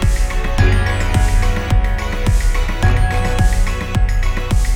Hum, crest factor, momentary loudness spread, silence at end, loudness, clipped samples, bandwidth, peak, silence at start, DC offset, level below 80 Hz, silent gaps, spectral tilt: none; 12 dB; 4 LU; 0 s; -18 LUFS; under 0.1%; 15 kHz; -2 dBFS; 0 s; 0.5%; -16 dBFS; none; -5.5 dB/octave